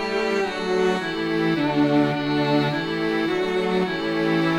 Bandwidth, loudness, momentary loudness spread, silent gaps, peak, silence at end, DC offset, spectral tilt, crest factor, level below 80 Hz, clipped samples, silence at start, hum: 13 kHz; -22 LUFS; 4 LU; none; -8 dBFS; 0 s; under 0.1%; -6.5 dB/octave; 14 dB; -54 dBFS; under 0.1%; 0 s; none